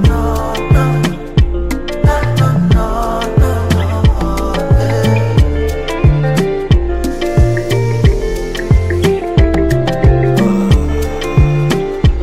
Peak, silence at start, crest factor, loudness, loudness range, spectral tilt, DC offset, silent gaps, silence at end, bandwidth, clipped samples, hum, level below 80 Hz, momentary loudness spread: 0 dBFS; 0 s; 12 dB; -13 LUFS; 1 LU; -7 dB/octave; under 0.1%; none; 0 s; 15.5 kHz; under 0.1%; none; -16 dBFS; 5 LU